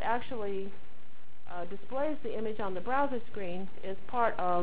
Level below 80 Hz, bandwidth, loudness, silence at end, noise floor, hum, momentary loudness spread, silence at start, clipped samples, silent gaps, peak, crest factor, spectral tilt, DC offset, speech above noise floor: -60 dBFS; 4 kHz; -35 LUFS; 0 s; -60 dBFS; none; 11 LU; 0 s; under 0.1%; none; -16 dBFS; 20 dB; -9 dB/octave; 4%; 26 dB